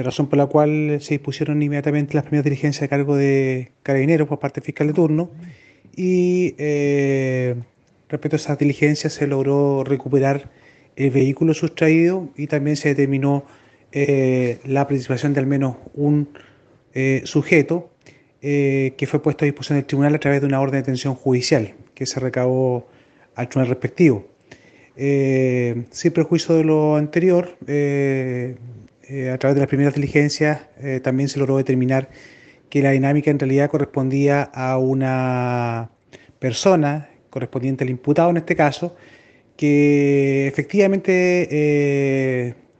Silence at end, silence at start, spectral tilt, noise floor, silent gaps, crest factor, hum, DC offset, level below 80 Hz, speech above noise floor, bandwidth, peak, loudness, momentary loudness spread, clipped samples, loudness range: 0.25 s; 0 s; -7 dB/octave; -52 dBFS; none; 20 dB; none; under 0.1%; -60 dBFS; 33 dB; 8.4 kHz; 0 dBFS; -19 LUFS; 9 LU; under 0.1%; 3 LU